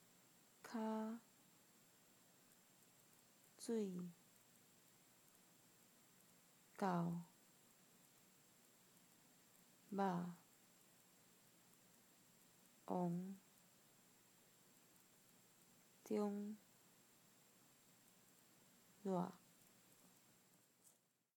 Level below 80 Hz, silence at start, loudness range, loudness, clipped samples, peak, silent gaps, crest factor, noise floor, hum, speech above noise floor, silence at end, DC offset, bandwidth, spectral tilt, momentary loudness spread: under -90 dBFS; 0.65 s; 3 LU; -47 LUFS; under 0.1%; -28 dBFS; none; 24 dB; -77 dBFS; none; 32 dB; 2 s; under 0.1%; 19 kHz; -6.5 dB/octave; 25 LU